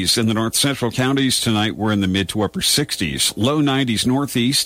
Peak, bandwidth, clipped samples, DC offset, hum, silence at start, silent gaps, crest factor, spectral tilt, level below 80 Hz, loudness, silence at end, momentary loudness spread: -6 dBFS; 16 kHz; under 0.1%; under 0.1%; none; 0 s; none; 14 dB; -3.5 dB/octave; -46 dBFS; -18 LUFS; 0 s; 3 LU